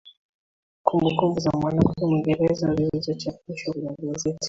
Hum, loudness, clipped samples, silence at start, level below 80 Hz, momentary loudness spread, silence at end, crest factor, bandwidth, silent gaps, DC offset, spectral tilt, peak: none; -24 LUFS; under 0.1%; 0.05 s; -48 dBFS; 9 LU; 0 s; 22 dB; 7.8 kHz; 0.17-0.85 s; under 0.1%; -6.5 dB/octave; -2 dBFS